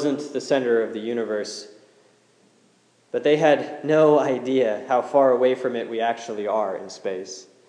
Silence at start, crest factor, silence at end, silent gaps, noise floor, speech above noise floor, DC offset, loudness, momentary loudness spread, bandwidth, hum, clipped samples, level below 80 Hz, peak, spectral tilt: 0 s; 18 dB; 0.25 s; none; -60 dBFS; 38 dB; under 0.1%; -22 LUFS; 13 LU; 10 kHz; none; under 0.1%; -88 dBFS; -4 dBFS; -5 dB/octave